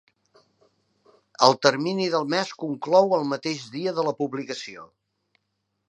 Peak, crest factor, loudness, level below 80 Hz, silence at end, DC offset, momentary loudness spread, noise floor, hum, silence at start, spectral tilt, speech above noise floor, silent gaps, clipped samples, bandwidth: 0 dBFS; 26 dB; -23 LUFS; -78 dBFS; 1.05 s; under 0.1%; 13 LU; -77 dBFS; none; 1.4 s; -4.5 dB/octave; 54 dB; none; under 0.1%; 11 kHz